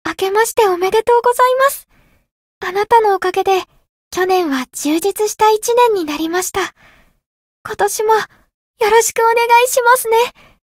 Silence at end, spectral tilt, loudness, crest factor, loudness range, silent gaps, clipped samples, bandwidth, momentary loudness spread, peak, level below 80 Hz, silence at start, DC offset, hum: 0.4 s; -1.5 dB/octave; -14 LUFS; 16 dB; 3 LU; 2.31-2.61 s, 3.89-4.11 s, 7.26-7.65 s, 8.54-8.74 s; under 0.1%; 16.5 kHz; 10 LU; 0 dBFS; -52 dBFS; 0.05 s; under 0.1%; none